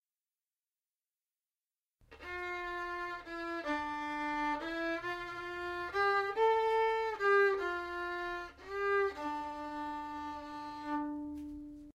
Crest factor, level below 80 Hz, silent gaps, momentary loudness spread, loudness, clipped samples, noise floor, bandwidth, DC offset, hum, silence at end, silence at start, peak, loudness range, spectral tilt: 18 dB; -64 dBFS; none; 13 LU; -35 LUFS; under 0.1%; under -90 dBFS; 14.5 kHz; under 0.1%; none; 0.05 s; 2.1 s; -18 dBFS; 9 LU; -4.5 dB/octave